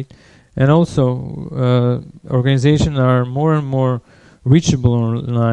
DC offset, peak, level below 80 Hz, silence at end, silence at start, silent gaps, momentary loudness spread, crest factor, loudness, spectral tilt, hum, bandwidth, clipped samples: under 0.1%; 0 dBFS; -40 dBFS; 0 s; 0 s; none; 11 LU; 16 dB; -16 LUFS; -7.5 dB/octave; none; 9 kHz; under 0.1%